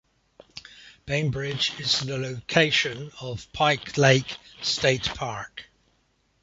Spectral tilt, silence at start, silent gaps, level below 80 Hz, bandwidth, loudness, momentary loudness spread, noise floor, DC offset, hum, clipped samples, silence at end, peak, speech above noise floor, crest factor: -4 dB/octave; 0.55 s; none; -54 dBFS; 8 kHz; -24 LUFS; 22 LU; -68 dBFS; under 0.1%; none; under 0.1%; 0.8 s; -2 dBFS; 43 dB; 24 dB